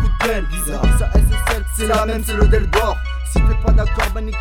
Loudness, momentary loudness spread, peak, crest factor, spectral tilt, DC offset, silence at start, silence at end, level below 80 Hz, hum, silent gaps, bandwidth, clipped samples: -18 LUFS; 6 LU; -2 dBFS; 14 dB; -5 dB/octave; 0.4%; 0 s; 0 s; -16 dBFS; none; none; 17 kHz; under 0.1%